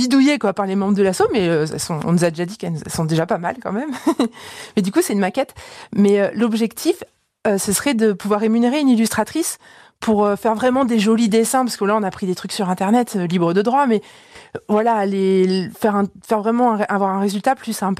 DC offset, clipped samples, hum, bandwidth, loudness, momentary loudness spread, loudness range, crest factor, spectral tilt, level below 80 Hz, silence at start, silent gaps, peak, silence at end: under 0.1%; under 0.1%; none; 15 kHz; -18 LUFS; 9 LU; 3 LU; 14 dB; -5.5 dB/octave; -56 dBFS; 0 s; none; -4 dBFS; 0.05 s